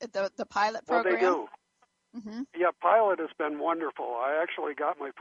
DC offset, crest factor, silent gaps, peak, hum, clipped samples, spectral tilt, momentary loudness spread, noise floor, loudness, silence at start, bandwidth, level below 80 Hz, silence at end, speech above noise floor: under 0.1%; 18 dB; none; -12 dBFS; none; under 0.1%; -4.5 dB/octave; 15 LU; -71 dBFS; -28 LUFS; 0 s; 7.6 kHz; -78 dBFS; 0 s; 43 dB